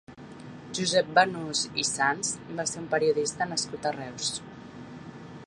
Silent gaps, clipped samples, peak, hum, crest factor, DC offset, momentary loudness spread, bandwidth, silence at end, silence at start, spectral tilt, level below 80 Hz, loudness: none; under 0.1%; -6 dBFS; none; 24 dB; under 0.1%; 21 LU; 11.5 kHz; 0 s; 0.1 s; -2.5 dB/octave; -64 dBFS; -27 LUFS